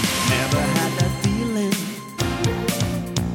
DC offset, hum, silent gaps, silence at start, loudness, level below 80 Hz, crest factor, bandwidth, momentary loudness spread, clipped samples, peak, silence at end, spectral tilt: under 0.1%; none; none; 0 s; -22 LUFS; -38 dBFS; 16 dB; 17 kHz; 6 LU; under 0.1%; -6 dBFS; 0 s; -4.5 dB/octave